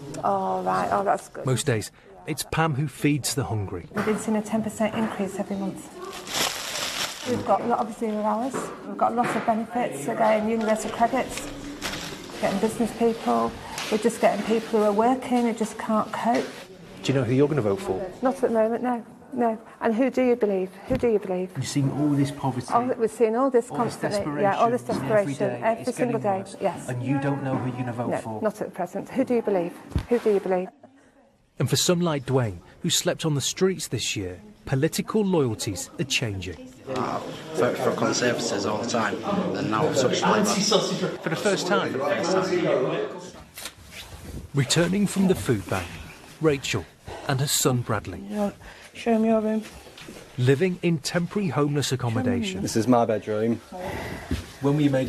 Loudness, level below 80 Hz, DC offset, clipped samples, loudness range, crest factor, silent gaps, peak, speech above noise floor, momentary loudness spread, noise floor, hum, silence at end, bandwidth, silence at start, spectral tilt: -25 LUFS; -52 dBFS; under 0.1%; under 0.1%; 3 LU; 18 dB; none; -6 dBFS; 34 dB; 11 LU; -59 dBFS; none; 0 s; 13.5 kHz; 0 s; -5 dB/octave